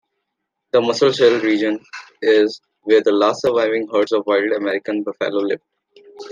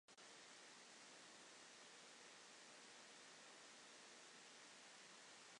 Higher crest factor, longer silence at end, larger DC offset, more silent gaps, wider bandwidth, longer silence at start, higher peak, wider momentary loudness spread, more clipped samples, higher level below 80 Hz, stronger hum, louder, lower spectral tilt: about the same, 16 dB vs 14 dB; about the same, 0 s vs 0 s; neither; neither; second, 9.2 kHz vs 11 kHz; first, 0.75 s vs 0.1 s; first, -2 dBFS vs -50 dBFS; first, 10 LU vs 0 LU; neither; first, -68 dBFS vs under -90 dBFS; neither; first, -18 LUFS vs -61 LUFS; first, -4.5 dB/octave vs -0.5 dB/octave